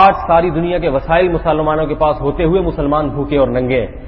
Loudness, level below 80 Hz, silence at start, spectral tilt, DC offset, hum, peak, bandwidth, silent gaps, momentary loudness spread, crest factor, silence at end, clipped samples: -15 LUFS; -28 dBFS; 0 s; -9.5 dB/octave; under 0.1%; none; 0 dBFS; 5.8 kHz; none; 3 LU; 14 dB; 0 s; under 0.1%